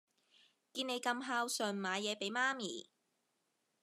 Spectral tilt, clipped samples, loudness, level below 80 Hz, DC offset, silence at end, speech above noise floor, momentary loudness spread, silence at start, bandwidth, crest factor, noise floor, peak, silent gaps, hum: -2.5 dB/octave; under 0.1%; -38 LUFS; under -90 dBFS; under 0.1%; 1 s; 44 dB; 9 LU; 0.75 s; 13 kHz; 22 dB; -83 dBFS; -20 dBFS; none; none